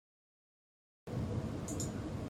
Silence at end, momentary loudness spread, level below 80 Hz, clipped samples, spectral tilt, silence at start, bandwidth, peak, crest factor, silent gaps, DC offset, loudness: 0 s; 5 LU; -56 dBFS; under 0.1%; -6 dB/octave; 1.05 s; 16 kHz; -26 dBFS; 16 dB; none; under 0.1%; -40 LUFS